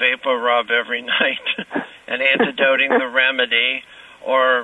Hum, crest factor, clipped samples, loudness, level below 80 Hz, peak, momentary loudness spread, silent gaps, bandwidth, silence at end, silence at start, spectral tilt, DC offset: none; 18 dB; under 0.1%; -17 LUFS; -66 dBFS; 0 dBFS; 11 LU; none; 10 kHz; 0 s; 0 s; -4.5 dB/octave; under 0.1%